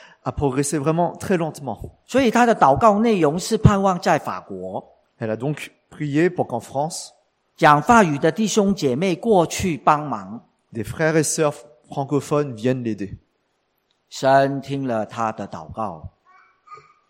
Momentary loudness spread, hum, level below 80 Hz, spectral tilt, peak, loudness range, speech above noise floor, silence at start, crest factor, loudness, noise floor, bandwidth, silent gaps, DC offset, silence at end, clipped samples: 17 LU; none; -44 dBFS; -5.5 dB/octave; 0 dBFS; 6 LU; 50 dB; 0.25 s; 20 dB; -20 LUFS; -69 dBFS; 16.5 kHz; none; under 0.1%; 0.35 s; under 0.1%